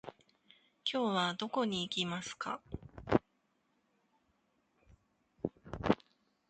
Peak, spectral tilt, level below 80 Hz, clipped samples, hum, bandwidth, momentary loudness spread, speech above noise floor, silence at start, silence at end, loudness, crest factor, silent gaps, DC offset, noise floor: -12 dBFS; -5 dB/octave; -60 dBFS; under 0.1%; none; 9 kHz; 11 LU; 42 dB; 0.05 s; 0.55 s; -36 LUFS; 28 dB; none; under 0.1%; -78 dBFS